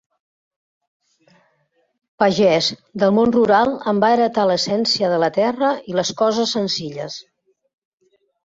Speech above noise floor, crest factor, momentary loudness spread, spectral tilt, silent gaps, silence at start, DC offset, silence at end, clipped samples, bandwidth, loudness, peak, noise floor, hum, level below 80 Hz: 48 dB; 18 dB; 8 LU; -4.5 dB/octave; none; 2.2 s; under 0.1%; 1.25 s; under 0.1%; 7.8 kHz; -18 LUFS; -2 dBFS; -65 dBFS; none; -58 dBFS